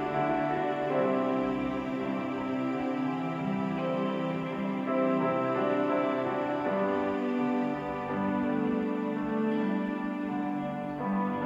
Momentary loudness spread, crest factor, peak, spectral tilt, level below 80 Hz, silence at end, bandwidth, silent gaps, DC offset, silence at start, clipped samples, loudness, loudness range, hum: 5 LU; 14 dB; -16 dBFS; -8 dB/octave; -62 dBFS; 0 s; 7.6 kHz; none; under 0.1%; 0 s; under 0.1%; -30 LUFS; 2 LU; none